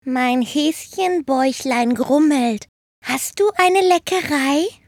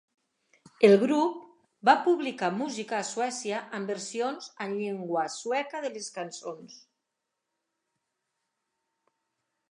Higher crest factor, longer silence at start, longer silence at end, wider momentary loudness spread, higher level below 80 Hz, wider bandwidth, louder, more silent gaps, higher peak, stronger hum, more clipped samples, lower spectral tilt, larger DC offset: second, 16 dB vs 24 dB; second, 0.05 s vs 0.8 s; second, 0.15 s vs 2.95 s; second, 8 LU vs 15 LU; first, -60 dBFS vs -84 dBFS; first, 18 kHz vs 11 kHz; first, -18 LUFS vs -28 LUFS; first, 2.69-3.02 s vs none; first, -2 dBFS vs -6 dBFS; neither; neither; second, -3 dB/octave vs -4.5 dB/octave; neither